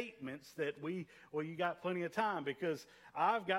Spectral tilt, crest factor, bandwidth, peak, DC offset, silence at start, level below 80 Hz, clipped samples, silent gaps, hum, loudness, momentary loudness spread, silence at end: -5.5 dB/octave; 20 dB; 16 kHz; -18 dBFS; under 0.1%; 0 s; -82 dBFS; under 0.1%; none; none; -40 LUFS; 10 LU; 0 s